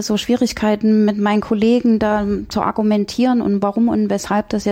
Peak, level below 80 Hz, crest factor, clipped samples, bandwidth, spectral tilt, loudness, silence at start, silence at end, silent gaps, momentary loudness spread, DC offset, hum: -4 dBFS; -44 dBFS; 12 dB; under 0.1%; 15.5 kHz; -6 dB/octave; -17 LUFS; 0 s; 0 s; none; 5 LU; under 0.1%; none